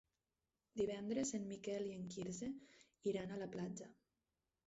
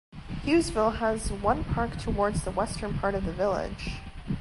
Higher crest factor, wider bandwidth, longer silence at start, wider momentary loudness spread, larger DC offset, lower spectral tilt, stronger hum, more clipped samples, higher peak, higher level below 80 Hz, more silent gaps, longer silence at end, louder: about the same, 18 dB vs 18 dB; second, 8 kHz vs 11.5 kHz; first, 0.75 s vs 0.15 s; about the same, 10 LU vs 11 LU; neither; about the same, -6.5 dB/octave vs -6 dB/octave; neither; neither; second, -28 dBFS vs -10 dBFS; second, -76 dBFS vs -38 dBFS; neither; first, 0.75 s vs 0 s; second, -46 LUFS vs -29 LUFS